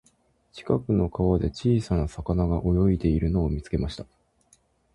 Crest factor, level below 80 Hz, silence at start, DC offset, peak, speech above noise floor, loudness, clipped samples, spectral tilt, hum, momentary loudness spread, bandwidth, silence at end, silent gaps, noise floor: 18 dB; -34 dBFS; 0.55 s; under 0.1%; -8 dBFS; 41 dB; -25 LUFS; under 0.1%; -8.5 dB/octave; none; 7 LU; 11 kHz; 0.9 s; none; -65 dBFS